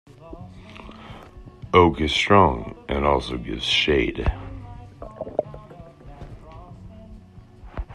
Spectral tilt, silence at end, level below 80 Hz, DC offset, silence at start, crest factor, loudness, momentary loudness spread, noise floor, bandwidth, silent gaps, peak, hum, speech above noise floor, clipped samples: -5.5 dB/octave; 0 s; -38 dBFS; under 0.1%; 0.2 s; 22 dB; -21 LUFS; 26 LU; -45 dBFS; 11.5 kHz; none; -2 dBFS; none; 25 dB; under 0.1%